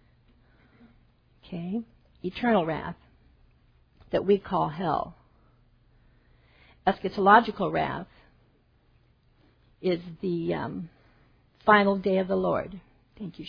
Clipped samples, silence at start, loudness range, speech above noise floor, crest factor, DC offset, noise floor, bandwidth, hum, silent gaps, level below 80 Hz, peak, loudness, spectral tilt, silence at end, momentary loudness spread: under 0.1%; 1.45 s; 6 LU; 38 dB; 26 dB; under 0.1%; -64 dBFS; 5.2 kHz; none; none; -58 dBFS; -4 dBFS; -26 LUFS; -8.5 dB/octave; 0 s; 20 LU